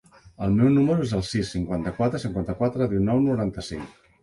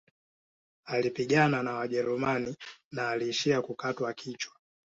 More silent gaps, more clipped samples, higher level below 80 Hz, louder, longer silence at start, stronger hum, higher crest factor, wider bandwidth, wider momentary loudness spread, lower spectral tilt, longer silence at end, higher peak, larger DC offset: second, none vs 2.84-2.91 s; neither; first, -44 dBFS vs -70 dBFS; first, -24 LUFS vs -30 LUFS; second, 0.4 s vs 0.85 s; neither; second, 14 dB vs 20 dB; first, 11.5 kHz vs 8 kHz; about the same, 12 LU vs 13 LU; first, -7.5 dB/octave vs -5 dB/octave; about the same, 0.35 s vs 0.35 s; about the same, -10 dBFS vs -12 dBFS; neither